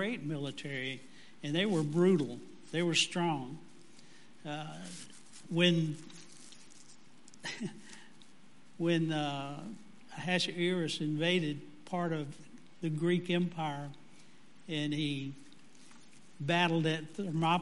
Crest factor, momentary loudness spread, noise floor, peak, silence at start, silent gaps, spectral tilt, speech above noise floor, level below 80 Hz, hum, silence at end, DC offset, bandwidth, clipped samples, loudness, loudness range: 20 dB; 22 LU; -62 dBFS; -14 dBFS; 0 s; none; -5 dB/octave; 28 dB; -78 dBFS; none; 0 s; 0.3%; 11.5 kHz; under 0.1%; -34 LUFS; 6 LU